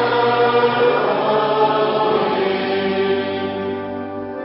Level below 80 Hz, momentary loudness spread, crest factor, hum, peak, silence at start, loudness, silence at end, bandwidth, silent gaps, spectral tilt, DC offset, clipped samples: -60 dBFS; 9 LU; 14 dB; none; -4 dBFS; 0 s; -18 LUFS; 0 s; 5.8 kHz; none; -10.5 dB/octave; under 0.1%; under 0.1%